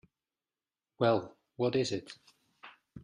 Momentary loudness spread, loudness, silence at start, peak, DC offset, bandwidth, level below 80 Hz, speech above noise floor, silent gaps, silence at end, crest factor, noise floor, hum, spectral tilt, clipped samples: 22 LU; -32 LUFS; 1 s; -14 dBFS; under 0.1%; 10.5 kHz; -72 dBFS; over 59 dB; none; 0.05 s; 20 dB; under -90 dBFS; none; -5.5 dB/octave; under 0.1%